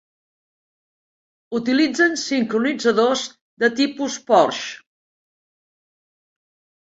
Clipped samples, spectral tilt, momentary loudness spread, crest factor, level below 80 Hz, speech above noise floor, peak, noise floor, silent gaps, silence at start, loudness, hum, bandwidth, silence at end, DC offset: under 0.1%; -3 dB/octave; 12 LU; 20 dB; -68 dBFS; over 71 dB; -2 dBFS; under -90 dBFS; 3.41-3.57 s; 1.5 s; -19 LUFS; none; 8 kHz; 2.1 s; under 0.1%